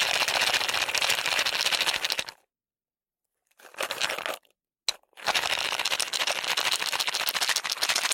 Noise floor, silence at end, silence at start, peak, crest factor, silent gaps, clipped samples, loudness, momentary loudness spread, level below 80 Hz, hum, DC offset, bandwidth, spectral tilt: under -90 dBFS; 0 s; 0 s; -4 dBFS; 24 dB; none; under 0.1%; -25 LUFS; 9 LU; -68 dBFS; none; under 0.1%; 17 kHz; 1.5 dB/octave